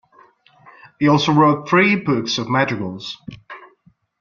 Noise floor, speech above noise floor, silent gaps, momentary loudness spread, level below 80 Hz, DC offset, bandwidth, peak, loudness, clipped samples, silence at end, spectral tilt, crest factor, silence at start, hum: -57 dBFS; 40 dB; none; 22 LU; -58 dBFS; under 0.1%; 7.2 kHz; -2 dBFS; -17 LUFS; under 0.1%; 0.55 s; -5.5 dB/octave; 18 dB; 1 s; none